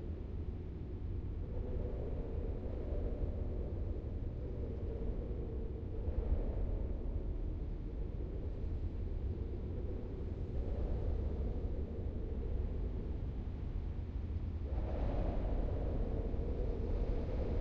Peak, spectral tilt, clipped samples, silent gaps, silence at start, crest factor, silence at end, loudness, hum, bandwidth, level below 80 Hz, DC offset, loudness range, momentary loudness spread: -24 dBFS; -9.5 dB/octave; under 0.1%; none; 0 s; 14 dB; 0 s; -42 LUFS; none; 5 kHz; -40 dBFS; under 0.1%; 2 LU; 4 LU